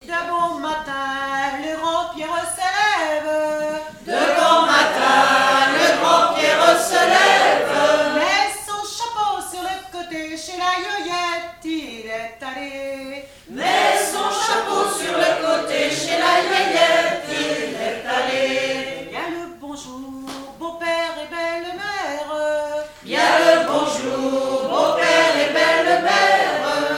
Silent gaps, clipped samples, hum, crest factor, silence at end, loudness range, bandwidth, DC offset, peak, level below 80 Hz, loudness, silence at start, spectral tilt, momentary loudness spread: none; under 0.1%; none; 20 dB; 0 s; 11 LU; 17 kHz; under 0.1%; 0 dBFS; -56 dBFS; -18 LUFS; 0.05 s; -2 dB/octave; 15 LU